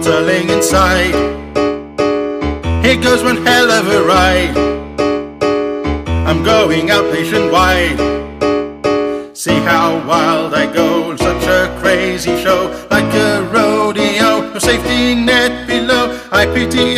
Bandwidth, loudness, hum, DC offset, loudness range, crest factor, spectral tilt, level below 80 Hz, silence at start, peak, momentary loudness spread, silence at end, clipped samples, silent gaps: 15.5 kHz; -13 LUFS; none; under 0.1%; 2 LU; 12 dB; -4.5 dB/octave; -28 dBFS; 0 s; 0 dBFS; 6 LU; 0 s; under 0.1%; none